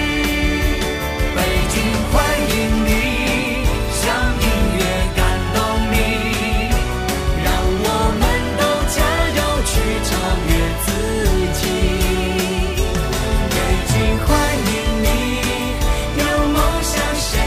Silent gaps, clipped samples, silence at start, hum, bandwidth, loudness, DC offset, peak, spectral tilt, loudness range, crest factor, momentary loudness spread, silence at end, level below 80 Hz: none; under 0.1%; 0 s; none; 15.5 kHz; -18 LUFS; under 0.1%; -4 dBFS; -4.5 dB/octave; 1 LU; 14 dB; 3 LU; 0 s; -22 dBFS